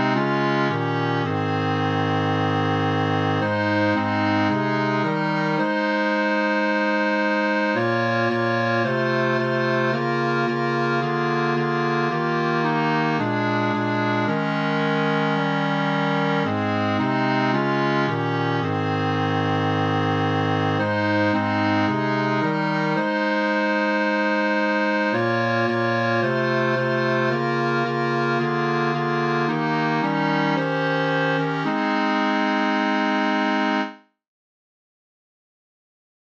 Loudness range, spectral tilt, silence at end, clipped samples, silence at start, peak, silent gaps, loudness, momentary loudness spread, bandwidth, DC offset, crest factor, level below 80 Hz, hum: 1 LU; -7 dB/octave; 2.25 s; under 0.1%; 0 s; -8 dBFS; none; -21 LUFS; 2 LU; 8 kHz; under 0.1%; 14 dB; -72 dBFS; none